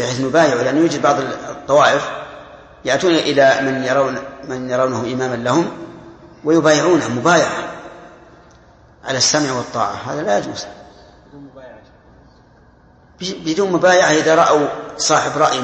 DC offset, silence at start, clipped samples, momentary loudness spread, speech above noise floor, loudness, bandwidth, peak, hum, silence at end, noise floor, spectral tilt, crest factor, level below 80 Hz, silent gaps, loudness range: under 0.1%; 0 s; under 0.1%; 15 LU; 33 dB; -16 LUFS; 8.8 kHz; 0 dBFS; none; 0 s; -48 dBFS; -3.5 dB/octave; 18 dB; -54 dBFS; none; 9 LU